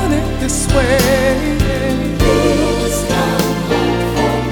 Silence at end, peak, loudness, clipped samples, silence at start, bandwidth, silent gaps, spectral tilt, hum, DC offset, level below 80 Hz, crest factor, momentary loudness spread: 0 s; 0 dBFS; -15 LUFS; under 0.1%; 0 s; over 20 kHz; none; -5 dB/octave; none; under 0.1%; -22 dBFS; 14 dB; 5 LU